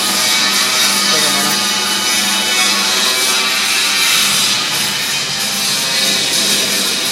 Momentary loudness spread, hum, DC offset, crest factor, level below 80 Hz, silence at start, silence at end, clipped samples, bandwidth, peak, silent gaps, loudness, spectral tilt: 4 LU; none; under 0.1%; 14 dB; -56 dBFS; 0 s; 0 s; under 0.1%; 16 kHz; 0 dBFS; none; -11 LUFS; 0 dB/octave